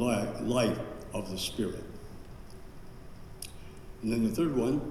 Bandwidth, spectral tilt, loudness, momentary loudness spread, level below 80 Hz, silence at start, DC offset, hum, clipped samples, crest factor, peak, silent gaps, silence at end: 15 kHz; -5.5 dB/octave; -32 LUFS; 22 LU; -48 dBFS; 0 s; under 0.1%; none; under 0.1%; 18 dB; -16 dBFS; none; 0 s